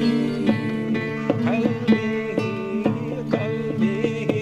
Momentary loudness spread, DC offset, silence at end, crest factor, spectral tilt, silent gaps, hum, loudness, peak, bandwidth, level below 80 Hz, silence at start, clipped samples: 4 LU; under 0.1%; 0 s; 18 dB; -7.5 dB/octave; none; none; -23 LUFS; -4 dBFS; 9.4 kHz; -56 dBFS; 0 s; under 0.1%